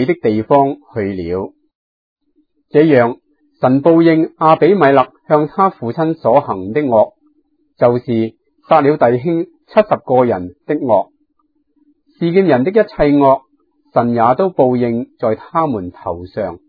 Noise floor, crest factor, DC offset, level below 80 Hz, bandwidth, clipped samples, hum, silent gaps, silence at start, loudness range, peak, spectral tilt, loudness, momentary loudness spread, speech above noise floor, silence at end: -63 dBFS; 14 dB; under 0.1%; -46 dBFS; 5 kHz; under 0.1%; none; 1.75-2.16 s; 0 s; 4 LU; 0 dBFS; -10.5 dB/octave; -14 LUFS; 11 LU; 50 dB; 0.1 s